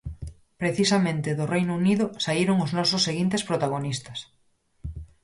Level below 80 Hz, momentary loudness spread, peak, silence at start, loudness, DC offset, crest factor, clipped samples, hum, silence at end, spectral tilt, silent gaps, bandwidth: -48 dBFS; 17 LU; -10 dBFS; 0.05 s; -24 LUFS; under 0.1%; 16 dB; under 0.1%; none; 0.2 s; -5 dB/octave; none; 11.5 kHz